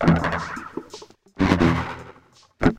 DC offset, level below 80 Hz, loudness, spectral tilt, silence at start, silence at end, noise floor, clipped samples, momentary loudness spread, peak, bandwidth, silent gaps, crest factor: under 0.1%; -38 dBFS; -23 LUFS; -7 dB/octave; 0 s; 0 s; -53 dBFS; under 0.1%; 20 LU; -2 dBFS; 10 kHz; none; 20 dB